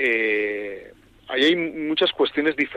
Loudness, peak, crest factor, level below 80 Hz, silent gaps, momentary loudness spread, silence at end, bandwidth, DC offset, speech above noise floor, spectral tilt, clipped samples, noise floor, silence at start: -22 LUFS; -8 dBFS; 14 dB; -60 dBFS; none; 11 LU; 0 s; 9.2 kHz; under 0.1%; 25 dB; -4.5 dB/octave; under 0.1%; -47 dBFS; 0 s